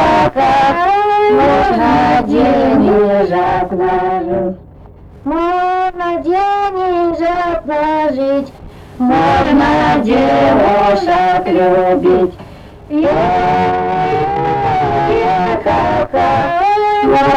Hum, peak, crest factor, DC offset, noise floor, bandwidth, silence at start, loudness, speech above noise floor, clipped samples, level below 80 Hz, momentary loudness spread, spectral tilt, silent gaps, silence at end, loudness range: none; -2 dBFS; 10 dB; under 0.1%; -36 dBFS; 10 kHz; 0 s; -12 LUFS; 25 dB; under 0.1%; -34 dBFS; 6 LU; -7 dB/octave; none; 0 s; 5 LU